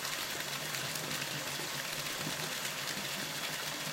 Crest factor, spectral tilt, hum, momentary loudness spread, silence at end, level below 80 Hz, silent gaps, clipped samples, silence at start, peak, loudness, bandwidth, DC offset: 20 dB; -1.5 dB/octave; none; 1 LU; 0 s; -70 dBFS; none; under 0.1%; 0 s; -18 dBFS; -36 LUFS; 17 kHz; under 0.1%